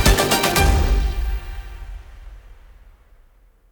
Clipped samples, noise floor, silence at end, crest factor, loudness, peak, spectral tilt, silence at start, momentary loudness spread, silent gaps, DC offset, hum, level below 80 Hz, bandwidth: under 0.1%; -53 dBFS; 1.2 s; 20 dB; -19 LUFS; -2 dBFS; -4 dB/octave; 0 s; 23 LU; none; under 0.1%; none; -24 dBFS; over 20 kHz